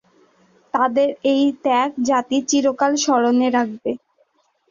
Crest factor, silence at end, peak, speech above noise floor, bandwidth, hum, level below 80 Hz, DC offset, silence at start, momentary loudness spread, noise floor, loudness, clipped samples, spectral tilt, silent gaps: 16 dB; 0.75 s; -4 dBFS; 45 dB; 7.4 kHz; none; -66 dBFS; under 0.1%; 0.75 s; 8 LU; -62 dBFS; -19 LUFS; under 0.1%; -3 dB/octave; none